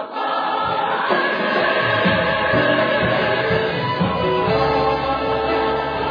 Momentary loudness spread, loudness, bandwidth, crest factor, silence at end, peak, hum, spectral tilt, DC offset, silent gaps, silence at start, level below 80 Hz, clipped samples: 4 LU; -18 LUFS; 5.2 kHz; 14 dB; 0 s; -4 dBFS; none; -7.5 dB/octave; under 0.1%; none; 0 s; -42 dBFS; under 0.1%